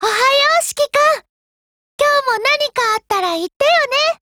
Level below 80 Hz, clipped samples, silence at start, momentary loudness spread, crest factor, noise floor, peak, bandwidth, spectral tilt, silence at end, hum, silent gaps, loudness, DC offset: -58 dBFS; under 0.1%; 0 s; 6 LU; 14 dB; under -90 dBFS; -2 dBFS; over 20 kHz; 0 dB/octave; 0.1 s; none; 1.29-1.99 s, 3.56-3.60 s; -15 LUFS; under 0.1%